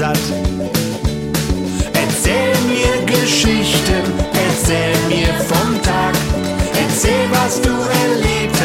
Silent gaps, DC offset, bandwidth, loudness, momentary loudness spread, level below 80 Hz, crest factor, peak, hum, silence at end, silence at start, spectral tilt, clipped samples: none; under 0.1%; 16.5 kHz; -15 LUFS; 5 LU; -26 dBFS; 14 dB; 0 dBFS; none; 0 s; 0 s; -4 dB/octave; under 0.1%